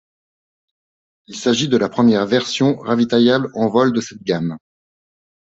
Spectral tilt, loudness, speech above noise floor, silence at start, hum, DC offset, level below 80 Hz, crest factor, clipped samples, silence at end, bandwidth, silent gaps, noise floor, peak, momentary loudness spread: -5.5 dB/octave; -17 LUFS; over 74 dB; 1.3 s; none; under 0.1%; -60 dBFS; 16 dB; under 0.1%; 0.95 s; 8 kHz; none; under -90 dBFS; -2 dBFS; 9 LU